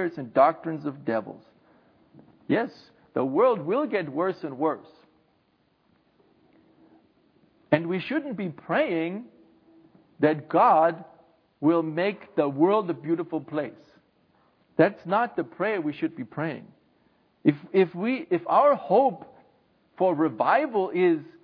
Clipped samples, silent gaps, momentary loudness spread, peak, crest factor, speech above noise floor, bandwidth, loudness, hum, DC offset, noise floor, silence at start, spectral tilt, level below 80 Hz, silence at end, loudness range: under 0.1%; none; 11 LU; -4 dBFS; 22 dB; 43 dB; 5.4 kHz; -25 LUFS; none; under 0.1%; -67 dBFS; 0 s; -9.5 dB/octave; -78 dBFS; 0.2 s; 8 LU